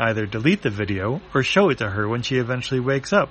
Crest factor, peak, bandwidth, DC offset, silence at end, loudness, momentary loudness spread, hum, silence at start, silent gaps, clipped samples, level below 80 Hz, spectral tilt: 18 dB; -4 dBFS; 8.8 kHz; under 0.1%; 0 s; -21 LUFS; 6 LU; none; 0 s; none; under 0.1%; -50 dBFS; -6 dB/octave